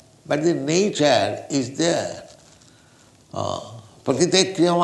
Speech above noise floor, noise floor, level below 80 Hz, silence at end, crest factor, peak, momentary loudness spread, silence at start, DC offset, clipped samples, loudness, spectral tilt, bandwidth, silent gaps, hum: 32 dB; -53 dBFS; -62 dBFS; 0 s; 20 dB; -4 dBFS; 15 LU; 0.25 s; under 0.1%; under 0.1%; -21 LUFS; -4 dB/octave; 12 kHz; none; none